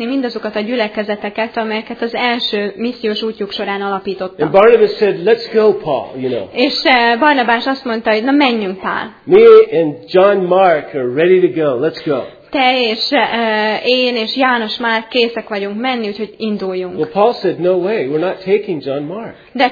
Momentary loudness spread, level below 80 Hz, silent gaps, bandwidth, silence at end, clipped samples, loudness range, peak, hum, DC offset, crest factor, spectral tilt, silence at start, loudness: 10 LU; -54 dBFS; none; 5 kHz; 0 s; 0.1%; 6 LU; 0 dBFS; none; under 0.1%; 14 dB; -6.5 dB/octave; 0 s; -14 LUFS